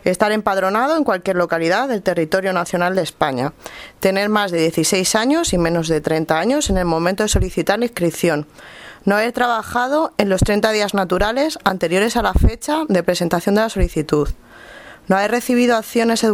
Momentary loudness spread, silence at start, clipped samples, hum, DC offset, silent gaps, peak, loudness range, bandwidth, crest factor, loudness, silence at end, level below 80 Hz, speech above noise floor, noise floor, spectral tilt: 4 LU; 0.05 s; under 0.1%; none; under 0.1%; none; 0 dBFS; 2 LU; 18 kHz; 18 dB; -18 LUFS; 0 s; -30 dBFS; 22 dB; -39 dBFS; -4.5 dB/octave